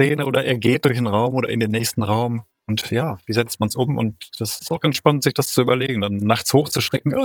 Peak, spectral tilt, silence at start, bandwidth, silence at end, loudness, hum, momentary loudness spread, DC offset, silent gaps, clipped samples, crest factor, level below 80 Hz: -2 dBFS; -5 dB/octave; 0 s; over 20 kHz; 0 s; -20 LUFS; none; 7 LU; under 0.1%; none; under 0.1%; 18 dB; -56 dBFS